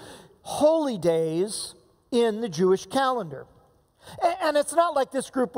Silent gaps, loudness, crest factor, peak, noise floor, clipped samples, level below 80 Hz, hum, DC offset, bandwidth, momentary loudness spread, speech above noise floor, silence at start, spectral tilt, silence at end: none; -25 LUFS; 18 dB; -8 dBFS; -60 dBFS; under 0.1%; -64 dBFS; none; under 0.1%; 16 kHz; 12 LU; 36 dB; 0 s; -4.5 dB/octave; 0 s